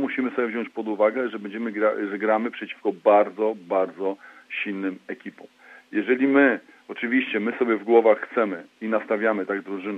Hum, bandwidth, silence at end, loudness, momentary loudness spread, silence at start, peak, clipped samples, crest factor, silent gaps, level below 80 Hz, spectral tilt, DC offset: none; 5.6 kHz; 0 s; -24 LUFS; 12 LU; 0 s; -4 dBFS; under 0.1%; 20 dB; none; -84 dBFS; -7.5 dB/octave; under 0.1%